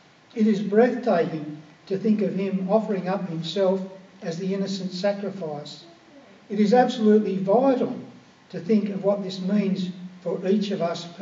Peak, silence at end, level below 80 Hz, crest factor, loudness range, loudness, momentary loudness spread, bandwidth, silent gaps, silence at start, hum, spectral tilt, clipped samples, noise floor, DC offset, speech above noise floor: -4 dBFS; 0 s; -80 dBFS; 20 dB; 5 LU; -24 LUFS; 16 LU; 7.6 kHz; none; 0.35 s; none; -7 dB/octave; under 0.1%; -50 dBFS; under 0.1%; 27 dB